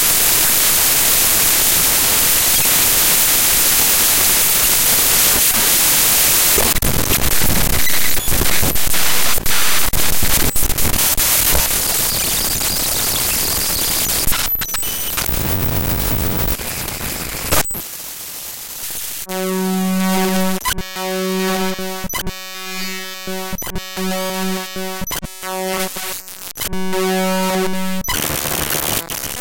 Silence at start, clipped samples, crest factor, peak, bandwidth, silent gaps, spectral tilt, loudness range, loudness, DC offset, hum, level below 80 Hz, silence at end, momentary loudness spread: 0 s; under 0.1%; 14 dB; 0 dBFS; 17.5 kHz; none; -2 dB/octave; 12 LU; -14 LUFS; under 0.1%; none; -30 dBFS; 0 s; 14 LU